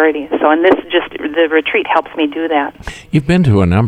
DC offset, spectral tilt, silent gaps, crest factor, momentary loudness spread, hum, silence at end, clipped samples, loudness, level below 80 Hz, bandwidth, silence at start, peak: under 0.1%; -7.5 dB/octave; none; 12 dB; 7 LU; none; 0 s; under 0.1%; -14 LUFS; -36 dBFS; 11 kHz; 0 s; 0 dBFS